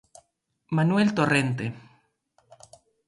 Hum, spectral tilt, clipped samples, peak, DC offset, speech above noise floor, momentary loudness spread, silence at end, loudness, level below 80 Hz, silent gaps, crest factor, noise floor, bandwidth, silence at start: none; -6.5 dB/octave; under 0.1%; -8 dBFS; under 0.1%; 47 dB; 13 LU; 1.3 s; -24 LUFS; -64 dBFS; none; 20 dB; -70 dBFS; 11.5 kHz; 0.7 s